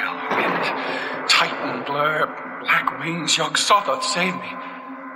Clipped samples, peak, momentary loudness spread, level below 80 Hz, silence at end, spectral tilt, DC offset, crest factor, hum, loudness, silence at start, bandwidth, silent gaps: under 0.1%; -2 dBFS; 12 LU; -70 dBFS; 0 s; -2 dB/octave; under 0.1%; 20 dB; none; -20 LUFS; 0 s; 17 kHz; none